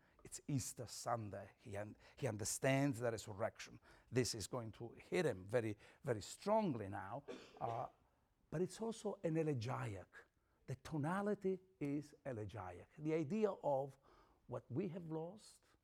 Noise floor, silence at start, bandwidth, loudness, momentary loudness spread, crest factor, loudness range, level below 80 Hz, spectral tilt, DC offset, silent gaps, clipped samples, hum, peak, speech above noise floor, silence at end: -78 dBFS; 0.25 s; 17.5 kHz; -44 LUFS; 14 LU; 20 dB; 3 LU; -74 dBFS; -5.5 dB/octave; under 0.1%; none; under 0.1%; none; -24 dBFS; 34 dB; 0.3 s